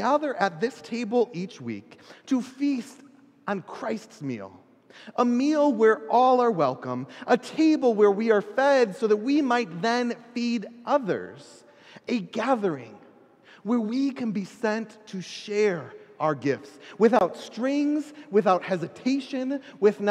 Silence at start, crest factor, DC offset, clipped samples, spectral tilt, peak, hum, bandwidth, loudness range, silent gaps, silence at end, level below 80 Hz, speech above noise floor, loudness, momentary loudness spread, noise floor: 0 s; 18 dB; under 0.1%; under 0.1%; -6 dB/octave; -6 dBFS; none; 10.5 kHz; 8 LU; none; 0 s; -80 dBFS; 29 dB; -25 LUFS; 14 LU; -54 dBFS